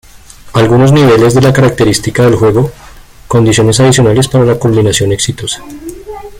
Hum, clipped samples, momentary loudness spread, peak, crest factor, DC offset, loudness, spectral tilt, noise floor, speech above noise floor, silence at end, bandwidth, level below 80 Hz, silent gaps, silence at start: none; under 0.1%; 13 LU; 0 dBFS; 8 dB; under 0.1%; -8 LUFS; -5.5 dB/octave; -33 dBFS; 25 dB; 0 s; 16 kHz; -32 dBFS; none; 0.45 s